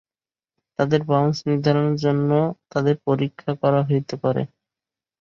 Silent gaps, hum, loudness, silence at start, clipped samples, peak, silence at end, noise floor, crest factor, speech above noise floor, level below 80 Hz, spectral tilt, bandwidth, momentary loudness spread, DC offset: none; none; -21 LUFS; 0.8 s; under 0.1%; -4 dBFS; 0.75 s; under -90 dBFS; 16 dB; over 70 dB; -62 dBFS; -8 dB/octave; 7 kHz; 6 LU; under 0.1%